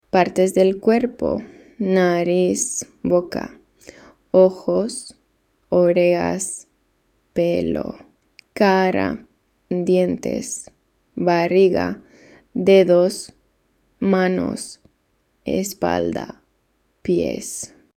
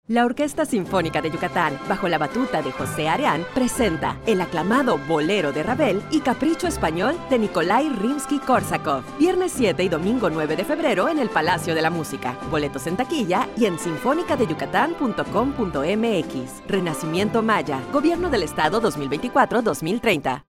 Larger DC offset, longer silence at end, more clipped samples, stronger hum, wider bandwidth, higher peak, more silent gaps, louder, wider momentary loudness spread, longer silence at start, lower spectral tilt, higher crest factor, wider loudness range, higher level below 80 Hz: neither; first, 0.3 s vs 0.1 s; neither; neither; about the same, 15.5 kHz vs 16.5 kHz; about the same, -2 dBFS vs -4 dBFS; neither; first, -19 LUFS vs -22 LUFS; first, 16 LU vs 4 LU; about the same, 0.15 s vs 0.1 s; about the same, -5.5 dB/octave vs -5 dB/octave; about the same, 18 dB vs 18 dB; first, 5 LU vs 2 LU; second, -54 dBFS vs -46 dBFS